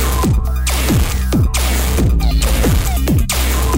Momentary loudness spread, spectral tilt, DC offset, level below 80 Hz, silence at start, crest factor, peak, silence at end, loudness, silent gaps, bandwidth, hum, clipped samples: 2 LU; -4.5 dB/octave; under 0.1%; -16 dBFS; 0 s; 10 dB; -2 dBFS; 0 s; -15 LUFS; none; 16.5 kHz; none; under 0.1%